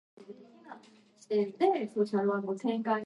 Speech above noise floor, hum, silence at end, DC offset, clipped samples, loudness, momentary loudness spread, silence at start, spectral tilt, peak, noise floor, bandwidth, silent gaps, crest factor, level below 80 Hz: 29 dB; none; 0 s; under 0.1%; under 0.1%; -31 LUFS; 23 LU; 0.2 s; -7 dB/octave; -14 dBFS; -59 dBFS; 11 kHz; none; 18 dB; -88 dBFS